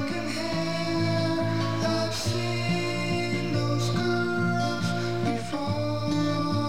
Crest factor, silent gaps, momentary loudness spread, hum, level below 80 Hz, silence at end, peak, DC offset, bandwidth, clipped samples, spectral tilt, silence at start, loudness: 12 dB; none; 3 LU; none; -54 dBFS; 0 s; -14 dBFS; 1%; 16 kHz; under 0.1%; -5.5 dB/octave; 0 s; -27 LUFS